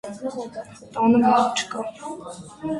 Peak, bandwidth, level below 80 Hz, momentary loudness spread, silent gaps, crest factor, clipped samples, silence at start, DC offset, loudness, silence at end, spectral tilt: -6 dBFS; 11.5 kHz; -60 dBFS; 19 LU; none; 18 dB; under 0.1%; 0.05 s; under 0.1%; -21 LUFS; 0 s; -4.5 dB/octave